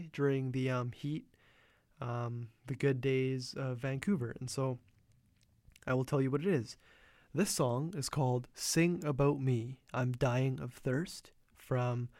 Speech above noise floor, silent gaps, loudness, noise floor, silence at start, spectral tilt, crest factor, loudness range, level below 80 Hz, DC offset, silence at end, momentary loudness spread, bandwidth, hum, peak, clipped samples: 35 dB; none; -35 LUFS; -70 dBFS; 0 s; -6 dB/octave; 18 dB; 4 LU; -62 dBFS; under 0.1%; 0.1 s; 10 LU; 16 kHz; none; -18 dBFS; under 0.1%